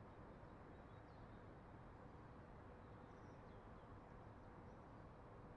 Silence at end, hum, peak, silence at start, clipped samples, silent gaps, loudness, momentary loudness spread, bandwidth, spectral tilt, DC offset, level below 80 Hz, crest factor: 0 s; none; -46 dBFS; 0 s; under 0.1%; none; -61 LUFS; 1 LU; 6.6 kHz; -7 dB/octave; under 0.1%; -68 dBFS; 14 dB